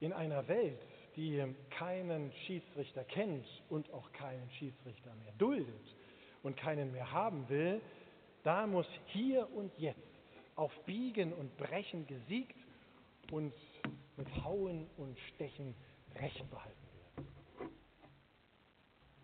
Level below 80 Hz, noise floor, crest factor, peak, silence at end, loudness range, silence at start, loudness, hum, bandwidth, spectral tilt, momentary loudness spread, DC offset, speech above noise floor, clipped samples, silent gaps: -70 dBFS; -70 dBFS; 24 dB; -18 dBFS; 0 s; 9 LU; 0 s; -42 LUFS; none; 4.5 kHz; -5.5 dB/octave; 19 LU; under 0.1%; 29 dB; under 0.1%; none